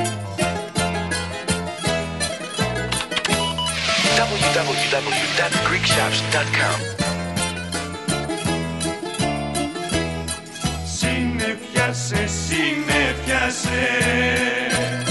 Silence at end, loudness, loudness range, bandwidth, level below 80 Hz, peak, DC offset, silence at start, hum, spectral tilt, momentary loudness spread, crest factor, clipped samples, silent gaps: 0 s; -21 LUFS; 5 LU; 12 kHz; -38 dBFS; -4 dBFS; 0.1%; 0 s; none; -3.5 dB/octave; 7 LU; 18 dB; under 0.1%; none